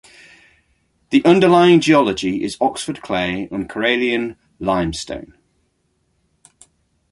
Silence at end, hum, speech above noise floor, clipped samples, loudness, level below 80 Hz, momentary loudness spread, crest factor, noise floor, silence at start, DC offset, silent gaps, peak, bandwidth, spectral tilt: 1.9 s; none; 50 dB; under 0.1%; -17 LUFS; -48 dBFS; 15 LU; 18 dB; -66 dBFS; 1.1 s; under 0.1%; none; 0 dBFS; 11.5 kHz; -5.5 dB/octave